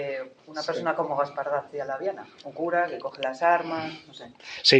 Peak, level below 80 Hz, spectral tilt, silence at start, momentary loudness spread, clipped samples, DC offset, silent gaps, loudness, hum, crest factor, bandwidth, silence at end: -4 dBFS; -76 dBFS; -4 dB/octave; 0 s; 17 LU; under 0.1%; under 0.1%; none; -28 LUFS; none; 24 dB; 9 kHz; 0 s